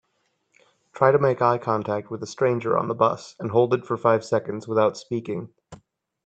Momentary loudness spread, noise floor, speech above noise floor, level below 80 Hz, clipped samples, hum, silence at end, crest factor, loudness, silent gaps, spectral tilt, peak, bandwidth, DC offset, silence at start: 11 LU; -72 dBFS; 49 dB; -66 dBFS; under 0.1%; none; 0.5 s; 22 dB; -23 LUFS; none; -7 dB/octave; -2 dBFS; 8.6 kHz; under 0.1%; 0.95 s